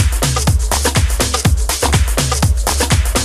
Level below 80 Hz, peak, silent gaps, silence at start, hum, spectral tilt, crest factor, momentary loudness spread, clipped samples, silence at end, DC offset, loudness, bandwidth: -18 dBFS; 0 dBFS; none; 0 s; none; -3.5 dB/octave; 14 dB; 1 LU; under 0.1%; 0 s; under 0.1%; -15 LUFS; 15.5 kHz